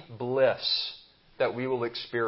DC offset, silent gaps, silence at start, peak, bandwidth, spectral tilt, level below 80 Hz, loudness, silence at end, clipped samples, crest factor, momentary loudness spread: under 0.1%; none; 0 s; -12 dBFS; 5.8 kHz; -8.5 dB/octave; -68 dBFS; -28 LUFS; 0 s; under 0.1%; 18 dB; 8 LU